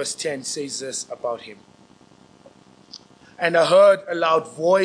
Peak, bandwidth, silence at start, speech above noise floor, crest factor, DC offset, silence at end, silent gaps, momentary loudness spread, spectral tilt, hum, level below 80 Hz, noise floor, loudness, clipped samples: -4 dBFS; 10.5 kHz; 0 s; 32 dB; 18 dB; under 0.1%; 0 s; none; 15 LU; -3 dB/octave; none; -72 dBFS; -52 dBFS; -20 LUFS; under 0.1%